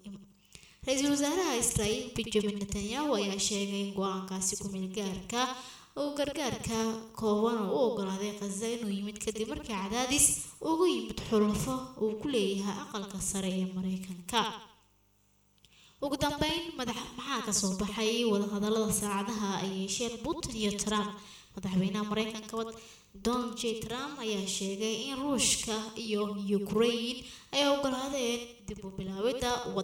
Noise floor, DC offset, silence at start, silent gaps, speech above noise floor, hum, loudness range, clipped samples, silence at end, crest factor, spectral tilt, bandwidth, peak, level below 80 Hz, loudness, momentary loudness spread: -68 dBFS; under 0.1%; 0.05 s; none; 36 dB; none; 5 LU; under 0.1%; 0 s; 22 dB; -3.5 dB/octave; 18.5 kHz; -12 dBFS; -56 dBFS; -32 LUFS; 9 LU